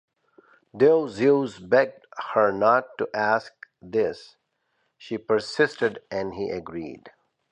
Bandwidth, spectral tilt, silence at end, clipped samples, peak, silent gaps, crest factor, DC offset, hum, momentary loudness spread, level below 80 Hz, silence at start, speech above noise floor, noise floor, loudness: 9.6 kHz; -6 dB/octave; 0.45 s; under 0.1%; -6 dBFS; none; 20 dB; under 0.1%; none; 15 LU; -64 dBFS; 0.75 s; 50 dB; -73 dBFS; -24 LUFS